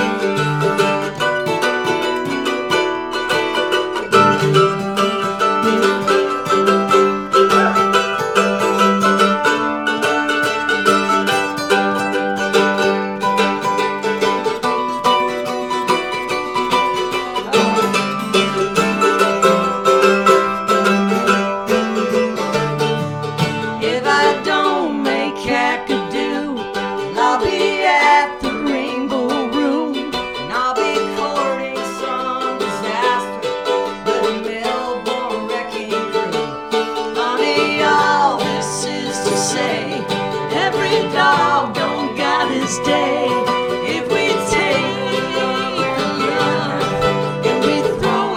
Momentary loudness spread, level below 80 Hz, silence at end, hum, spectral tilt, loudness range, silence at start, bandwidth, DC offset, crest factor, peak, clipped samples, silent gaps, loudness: 7 LU; -48 dBFS; 0 s; none; -4 dB/octave; 5 LU; 0 s; 17.5 kHz; under 0.1%; 16 dB; 0 dBFS; under 0.1%; none; -17 LUFS